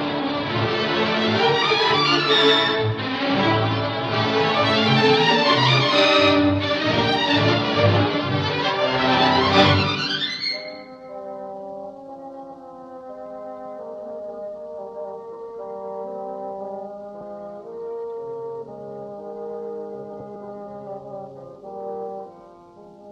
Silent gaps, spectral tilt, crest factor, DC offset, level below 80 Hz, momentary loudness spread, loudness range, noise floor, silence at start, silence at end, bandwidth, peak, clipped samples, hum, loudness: none; -5.5 dB/octave; 20 dB; under 0.1%; -54 dBFS; 20 LU; 18 LU; -45 dBFS; 0 s; 0 s; 9.2 kHz; -2 dBFS; under 0.1%; none; -19 LUFS